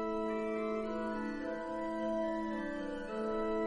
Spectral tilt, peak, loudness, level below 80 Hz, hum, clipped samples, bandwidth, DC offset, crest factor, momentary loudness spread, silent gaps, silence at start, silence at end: -6.5 dB/octave; -24 dBFS; -38 LUFS; -56 dBFS; none; under 0.1%; 10 kHz; under 0.1%; 12 dB; 4 LU; none; 0 s; 0 s